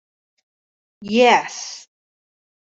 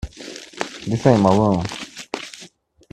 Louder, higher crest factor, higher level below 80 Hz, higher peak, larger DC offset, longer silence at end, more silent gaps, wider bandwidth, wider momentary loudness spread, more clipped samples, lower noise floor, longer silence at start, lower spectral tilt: first, -16 LUFS vs -20 LUFS; about the same, 20 dB vs 20 dB; second, -68 dBFS vs -44 dBFS; about the same, -2 dBFS vs 0 dBFS; neither; first, 0.95 s vs 0.45 s; neither; second, 8 kHz vs 12.5 kHz; first, 23 LU vs 20 LU; neither; first, under -90 dBFS vs -47 dBFS; first, 1 s vs 0.05 s; second, -3 dB/octave vs -6.5 dB/octave